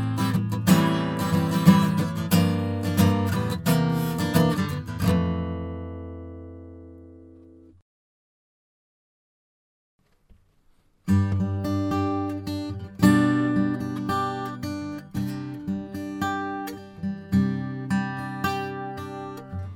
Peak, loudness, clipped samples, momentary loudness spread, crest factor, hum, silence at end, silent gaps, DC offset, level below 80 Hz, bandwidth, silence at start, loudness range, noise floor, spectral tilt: -2 dBFS; -25 LUFS; under 0.1%; 15 LU; 22 dB; none; 0 s; 7.82-9.99 s; under 0.1%; -54 dBFS; 19 kHz; 0 s; 9 LU; -61 dBFS; -6.5 dB/octave